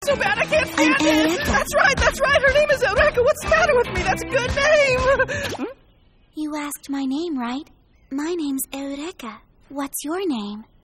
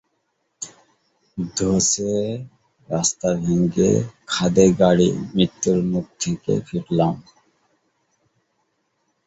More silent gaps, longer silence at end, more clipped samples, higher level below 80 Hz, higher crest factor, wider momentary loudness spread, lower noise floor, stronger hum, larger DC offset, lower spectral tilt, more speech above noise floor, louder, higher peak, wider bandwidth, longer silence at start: neither; second, 0.2 s vs 2.05 s; neither; first, -38 dBFS vs -50 dBFS; about the same, 16 dB vs 20 dB; about the same, 15 LU vs 17 LU; second, -55 dBFS vs -71 dBFS; neither; neither; about the same, -4 dB/octave vs -5 dB/octave; second, 30 dB vs 52 dB; about the same, -20 LUFS vs -20 LUFS; about the same, -4 dBFS vs -2 dBFS; first, 16 kHz vs 8 kHz; second, 0 s vs 0.6 s